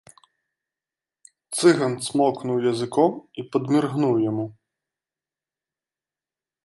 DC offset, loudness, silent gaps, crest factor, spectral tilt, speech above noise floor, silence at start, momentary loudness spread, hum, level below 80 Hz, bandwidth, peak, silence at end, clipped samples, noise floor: under 0.1%; -22 LUFS; none; 20 dB; -5.5 dB/octave; over 69 dB; 1.5 s; 11 LU; none; -70 dBFS; 11.5 kHz; -4 dBFS; 2.15 s; under 0.1%; under -90 dBFS